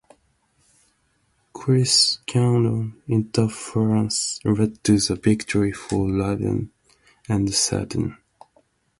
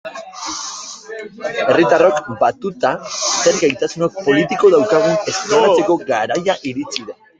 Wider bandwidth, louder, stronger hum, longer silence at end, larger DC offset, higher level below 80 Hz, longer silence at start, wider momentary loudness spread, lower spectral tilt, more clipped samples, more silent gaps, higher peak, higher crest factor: first, 11.5 kHz vs 9.4 kHz; second, -21 LUFS vs -16 LUFS; neither; first, 0.85 s vs 0.25 s; neither; first, -46 dBFS vs -58 dBFS; first, 1.55 s vs 0.05 s; second, 10 LU vs 14 LU; about the same, -4.5 dB/octave vs -3.5 dB/octave; neither; neither; second, -4 dBFS vs 0 dBFS; about the same, 18 dB vs 16 dB